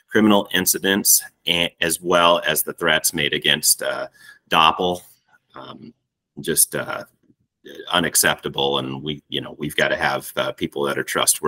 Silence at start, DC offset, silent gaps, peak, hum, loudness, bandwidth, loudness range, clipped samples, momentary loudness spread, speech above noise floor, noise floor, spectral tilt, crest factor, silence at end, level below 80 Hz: 0.1 s; under 0.1%; none; 0 dBFS; none; -19 LUFS; 16.5 kHz; 5 LU; under 0.1%; 14 LU; 42 dB; -62 dBFS; -2 dB/octave; 20 dB; 0 s; -58 dBFS